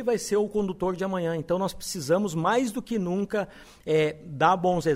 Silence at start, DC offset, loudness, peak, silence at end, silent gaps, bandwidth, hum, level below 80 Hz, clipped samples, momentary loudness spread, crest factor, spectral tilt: 0 s; under 0.1%; -26 LUFS; -8 dBFS; 0 s; none; 16 kHz; none; -54 dBFS; under 0.1%; 7 LU; 18 dB; -5.5 dB/octave